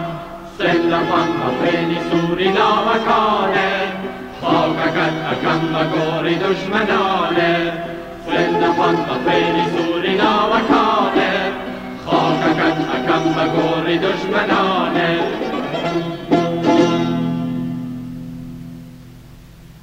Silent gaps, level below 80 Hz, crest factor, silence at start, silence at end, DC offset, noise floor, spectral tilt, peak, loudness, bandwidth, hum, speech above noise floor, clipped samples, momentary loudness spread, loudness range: none; -46 dBFS; 16 dB; 0 s; 0.05 s; under 0.1%; -40 dBFS; -6 dB/octave; 0 dBFS; -17 LUFS; 15.5 kHz; none; 23 dB; under 0.1%; 12 LU; 3 LU